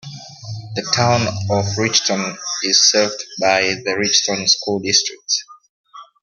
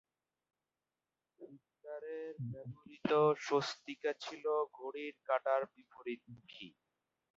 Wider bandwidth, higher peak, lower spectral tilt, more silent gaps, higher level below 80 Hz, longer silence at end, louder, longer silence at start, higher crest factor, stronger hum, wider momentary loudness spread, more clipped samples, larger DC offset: first, 12 kHz vs 7.6 kHz; first, 0 dBFS vs -20 dBFS; second, -2.5 dB/octave vs -4 dB/octave; first, 5.69-5.84 s vs none; first, -58 dBFS vs -82 dBFS; second, 0.2 s vs 0.7 s; first, -16 LUFS vs -38 LUFS; second, 0.05 s vs 1.4 s; about the same, 18 dB vs 20 dB; neither; second, 12 LU vs 22 LU; neither; neither